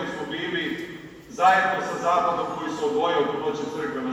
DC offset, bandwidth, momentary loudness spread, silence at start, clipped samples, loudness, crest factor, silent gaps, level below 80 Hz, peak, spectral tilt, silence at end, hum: under 0.1%; 14.5 kHz; 12 LU; 0 s; under 0.1%; -24 LUFS; 18 dB; none; -62 dBFS; -6 dBFS; -4.5 dB/octave; 0 s; none